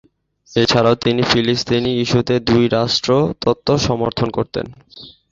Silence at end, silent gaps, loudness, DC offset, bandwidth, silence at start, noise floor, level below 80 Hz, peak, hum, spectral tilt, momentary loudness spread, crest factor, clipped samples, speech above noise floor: 0.25 s; none; -16 LUFS; under 0.1%; 7.6 kHz; 0.5 s; -50 dBFS; -42 dBFS; 0 dBFS; none; -5.5 dB/octave; 7 LU; 16 dB; under 0.1%; 33 dB